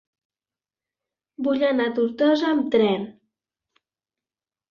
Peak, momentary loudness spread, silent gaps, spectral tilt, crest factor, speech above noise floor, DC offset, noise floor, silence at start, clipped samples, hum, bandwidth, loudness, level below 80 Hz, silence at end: -8 dBFS; 9 LU; none; -6.5 dB/octave; 18 dB; over 69 dB; under 0.1%; under -90 dBFS; 1.4 s; under 0.1%; none; 7 kHz; -22 LUFS; -68 dBFS; 1.6 s